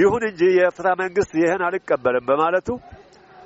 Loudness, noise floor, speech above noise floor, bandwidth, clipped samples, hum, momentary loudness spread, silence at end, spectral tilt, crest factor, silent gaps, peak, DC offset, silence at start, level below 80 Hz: -20 LUFS; -46 dBFS; 27 dB; 8 kHz; under 0.1%; none; 6 LU; 0.5 s; -4.5 dB/octave; 14 dB; none; -6 dBFS; under 0.1%; 0 s; -52 dBFS